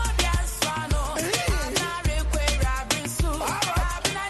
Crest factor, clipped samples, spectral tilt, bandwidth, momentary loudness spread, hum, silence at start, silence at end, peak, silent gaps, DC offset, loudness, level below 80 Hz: 18 dB; under 0.1%; -3.5 dB/octave; 12.5 kHz; 3 LU; none; 0 s; 0 s; -8 dBFS; none; under 0.1%; -25 LUFS; -28 dBFS